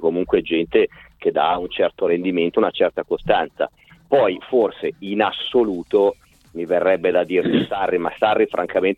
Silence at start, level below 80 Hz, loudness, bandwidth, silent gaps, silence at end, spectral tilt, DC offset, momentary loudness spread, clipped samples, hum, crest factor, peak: 0 s; -52 dBFS; -20 LUFS; 4.6 kHz; none; 0.05 s; -7 dB/octave; under 0.1%; 7 LU; under 0.1%; none; 16 dB; -2 dBFS